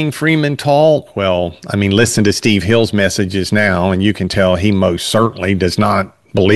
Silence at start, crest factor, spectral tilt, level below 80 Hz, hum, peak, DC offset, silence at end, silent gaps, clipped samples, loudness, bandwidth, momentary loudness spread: 0 s; 12 dB; -5.5 dB/octave; -44 dBFS; none; 0 dBFS; 0.4%; 0 s; none; under 0.1%; -14 LUFS; 12.5 kHz; 5 LU